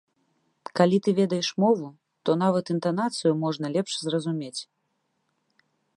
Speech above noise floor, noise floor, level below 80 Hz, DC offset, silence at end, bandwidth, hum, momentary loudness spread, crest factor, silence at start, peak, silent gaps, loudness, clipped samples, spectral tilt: 51 dB; -75 dBFS; -76 dBFS; under 0.1%; 1.35 s; 11 kHz; none; 11 LU; 22 dB; 0.75 s; -4 dBFS; none; -25 LUFS; under 0.1%; -6 dB/octave